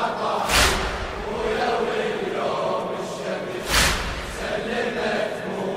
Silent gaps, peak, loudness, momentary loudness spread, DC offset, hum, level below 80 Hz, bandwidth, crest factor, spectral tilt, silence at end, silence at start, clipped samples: none; -4 dBFS; -23 LUFS; 10 LU; under 0.1%; none; -36 dBFS; 16 kHz; 20 dB; -3 dB/octave; 0 s; 0 s; under 0.1%